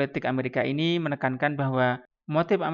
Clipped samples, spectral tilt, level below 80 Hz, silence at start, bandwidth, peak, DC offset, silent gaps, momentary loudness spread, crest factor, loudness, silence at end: under 0.1%; -8 dB/octave; -68 dBFS; 0 s; 7 kHz; -10 dBFS; under 0.1%; none; 3 LU; 16 dB; -26 LUFS; 0 s